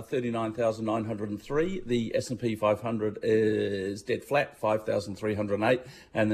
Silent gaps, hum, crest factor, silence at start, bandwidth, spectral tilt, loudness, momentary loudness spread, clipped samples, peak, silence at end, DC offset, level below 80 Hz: none; none; 16 dB; 0 s; 14 kHz; -6.5 dB/octave; -29 LUFS; 6 LU; under 0.1%; -12 dBFS; 0 s; under 0.1%; -56 dBFS